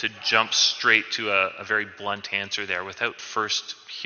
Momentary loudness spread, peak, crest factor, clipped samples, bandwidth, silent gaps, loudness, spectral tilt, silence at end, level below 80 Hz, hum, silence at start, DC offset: 10 LU; -2 dBFS; 22 dB; under 0.1%; 7 kHz; none; -23 LUFS; 1 dB/octave; 0 s; -70 dBFS; none; 0 s; under 0.1%